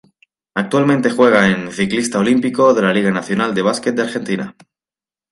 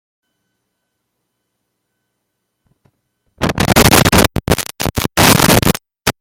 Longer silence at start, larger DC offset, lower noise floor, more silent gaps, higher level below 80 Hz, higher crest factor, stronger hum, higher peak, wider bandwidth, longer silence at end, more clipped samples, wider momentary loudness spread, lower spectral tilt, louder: second, 0.55 s vs 3.4 s; neither; first, under -90 dBFS vs -72 dBFS; neither; second, -56 dBFS vs -32 dBFS; about the same, 16 dB vs 16 dB; second, none vs 60 Hz at -40 dBFS; about the same, 0 dBFS vs 0 dBFS; second, 11.5 kHz vs over 20 kHz; first, 0.8 s vs 0.1 s; neither; about the same, 10 LU vs 11 LU; first, -5.5 dB/octave vs -3.5 dB/octave; second, -16 LUFS vs -12 LUFS